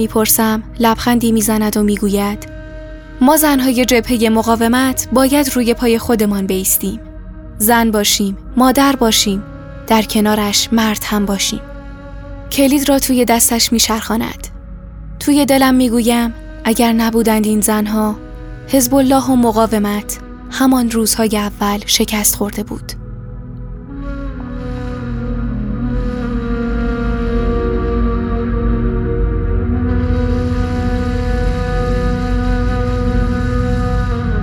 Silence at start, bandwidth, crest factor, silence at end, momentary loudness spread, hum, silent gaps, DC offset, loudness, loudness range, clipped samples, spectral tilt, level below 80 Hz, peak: 0 s; over 20 kHz; 14 dB; 0 s; 17 LU; none; none; under 0.1%; -14 LUFS; 6 LU; under 0.1%; -4.5 dB/octave; -24 dBFS; 0 dBFS